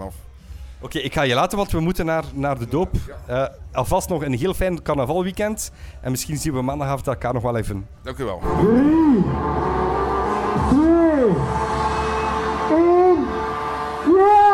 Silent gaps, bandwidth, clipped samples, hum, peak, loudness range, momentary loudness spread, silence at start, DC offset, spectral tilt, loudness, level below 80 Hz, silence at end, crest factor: none; 17 kHz; under 0.1%; none; -6 dBFS; 6 LU; 12 LU; 0 s; under 0.1%; -6 dB/octave; -20 LUFS; -34 dBFS; 0 s; 14 dB